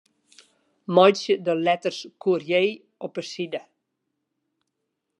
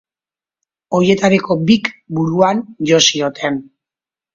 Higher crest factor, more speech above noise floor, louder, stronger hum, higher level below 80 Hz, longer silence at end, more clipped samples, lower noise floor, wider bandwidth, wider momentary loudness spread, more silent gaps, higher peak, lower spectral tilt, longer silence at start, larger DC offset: first, 22 dB vs 16 dB; second, 57 dB vs over 76 dB; second, -23 LUFS vs -15 LUFS; neither; second, -82 dBFS vs -56 dBFS; first, 1.6 s vs 0.75 s; neither; second, -80 dBFS vs under -90 dBFS; first, 10.5 kHz vs 7.8 kHz; first, 17 LU vs 10 LU; neither; about the same, -2 dBFS vs 0 dBFS; about the same, -5 dB/octave vs -4.5 dB/octave; about the same, 0.9 s vs 0.9 s; neither